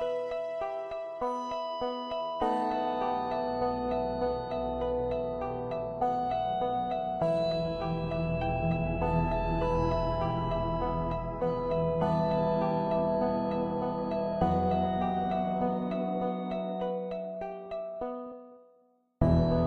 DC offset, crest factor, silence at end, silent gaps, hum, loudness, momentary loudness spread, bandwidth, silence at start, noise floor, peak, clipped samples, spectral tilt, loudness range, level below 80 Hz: under 0.1%; 20 dB; 0 s; none; none; -31 LUFS; 7 LU; 6.4 kHz; 0 s; -66 dBFS; -10 dBFS; under 0.1%; -8.5 dB/octave; 3 LU; -44 dBFS